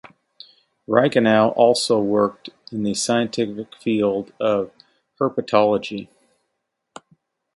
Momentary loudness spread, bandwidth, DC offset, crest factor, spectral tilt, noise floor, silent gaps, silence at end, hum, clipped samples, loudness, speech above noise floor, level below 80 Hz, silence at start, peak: 12 LU; 11.5 kHz; under 0.1%; 20 dB; -4.5 dB/octave; -77 dBFS; none; 1.5 s; none; under 0.1%; -20 LUFS; 57 dB; -62 dBFS; 0.9 s; -2 dBFS